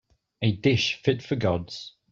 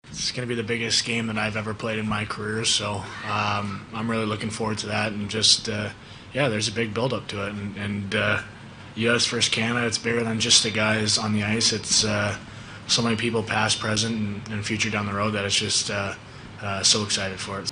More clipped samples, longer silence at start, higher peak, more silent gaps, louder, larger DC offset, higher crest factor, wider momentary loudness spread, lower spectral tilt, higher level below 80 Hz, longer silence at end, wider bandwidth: neither; first, 0.4 s vs 0.05 s; second, -8 dBFS vs -2 dBFS; neither; about the same, -25 LUFS vs -23 LUFS; neither; about the same, 20 dB vs 22 dB; about the same, 11 LU vs 12 LU; first, -6 dB/octave vs -3 dB/octave; about the same, -58 dBFS vs -54 dBFS; first, 0.2 s vs 0 s; second, 7.6 kHz vs 10.5 kHz